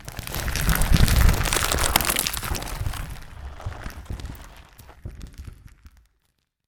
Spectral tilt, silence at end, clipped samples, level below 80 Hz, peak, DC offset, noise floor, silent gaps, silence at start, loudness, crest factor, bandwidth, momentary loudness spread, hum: -3.5 dB/octave; 0.8 s; under 0.1%; -28 dBFS; 0 dBFS; under 0.1%; -72 dBFS; none; 0 s; -23 LUFS; 24 dB; 19.5 kHz; 22 LU; none